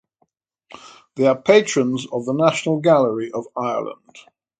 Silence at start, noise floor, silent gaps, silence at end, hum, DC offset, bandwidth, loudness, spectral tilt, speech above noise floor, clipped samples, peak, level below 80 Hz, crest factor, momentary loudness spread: 0.85 s; -68 dBFS; none; 0.4 s; none; under 0.1%; 9.4 kHz; -19 LUFS; -5 dB/octave; 49 dB; under 0.1%; 0 dBFS; -66 dBFS; 20 dB; 12 LU